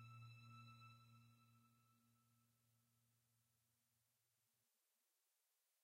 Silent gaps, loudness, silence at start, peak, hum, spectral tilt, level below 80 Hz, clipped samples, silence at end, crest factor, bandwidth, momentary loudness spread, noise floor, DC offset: none; -64 LUFS; 0 s; -52 dBFS; none; -4.5 dB/octave; under -90 dBFS; under 0.1%; 0 s; 18 dB; 15.5 kHz; 5 LU; -89 dBFS; under 0.1%